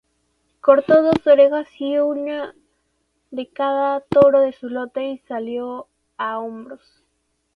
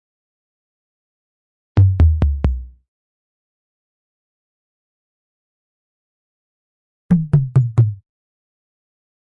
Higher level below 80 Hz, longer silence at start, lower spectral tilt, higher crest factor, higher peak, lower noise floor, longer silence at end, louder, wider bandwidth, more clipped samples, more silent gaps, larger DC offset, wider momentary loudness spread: second, -60 dBFS vs -30 dBFS; second, 0.65 s vs 1.75 s; second, -7.5 dB/octave vs -10.5 dB/octave; about the same, 20 dB vs 16 dB; first, 0 dBFS vs -4 dBFS; second, -70 dBFS vs under -90 dBFS; second, 0.8 s vs 1.35 s; about the same, -18 LUFS vs -17 LUFS; first, 5.2 kHz vs 4.2 kHz; neither; second, none vs 2.88-7.09 s; neither; first, 18 LU vs 9 LU